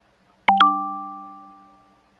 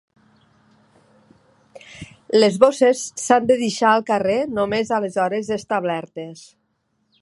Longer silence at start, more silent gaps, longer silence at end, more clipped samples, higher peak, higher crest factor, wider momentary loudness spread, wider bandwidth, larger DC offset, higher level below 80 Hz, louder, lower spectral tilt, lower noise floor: second, 0.5 s vs 1.75 s; neither; about the same, 0.8 s vs 0.8 s; neither; second, -4 dBFS vs 0 dBFS; about the same, 20 dB vs 20 dB; first, 22 LU vs 19 LU; second, 7.8 kHz vs 11.5 kHz; neither; second, -68 dBFS vs -60 dBFS; about the same, -19 LUFS vs -19 LUFS; about the same, -4.5 dB/octave vs -4 dB/octave; second, -56 dBFS vs -69 dBFS